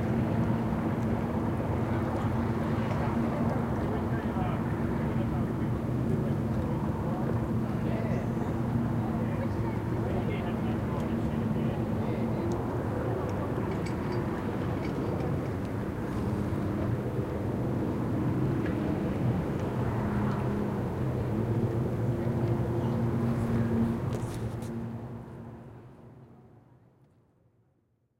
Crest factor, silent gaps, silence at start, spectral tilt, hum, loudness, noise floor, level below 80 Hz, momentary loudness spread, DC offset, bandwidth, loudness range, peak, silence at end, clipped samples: 14 dB; none; 0 s; -8.5 dB/octave; none; -31 LUFS; -71 dBFS; -44 dBFS; 3 LU; under 0.1%; 16 kHz; 2 LU; -16 dBFS; 1.7 s; under 0.1%